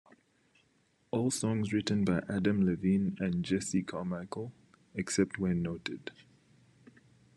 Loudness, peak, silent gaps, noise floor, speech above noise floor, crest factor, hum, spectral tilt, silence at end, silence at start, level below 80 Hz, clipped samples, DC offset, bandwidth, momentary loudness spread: -32 LUFS; -14 dBFS; none; -71 dBFS; 39 dB; 20 dB; none; -5.5 dB/octave; 1.25 s; 1.15 s; -64 dBFS; under 0.1%; under 0.1%; 12 kHz; 12 LU